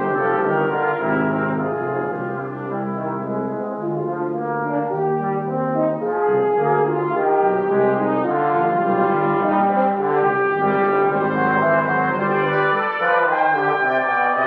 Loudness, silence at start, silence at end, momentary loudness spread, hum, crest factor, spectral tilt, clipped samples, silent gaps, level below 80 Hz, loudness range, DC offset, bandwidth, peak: -19 LUFS; 0 s; 0 s; 7 LU; none; 14 dB; -9.5 dB/octave; under 0.1%; none; -66 dBFS; 6 LU; under 0.1%; 5 kHz; -6 dBFS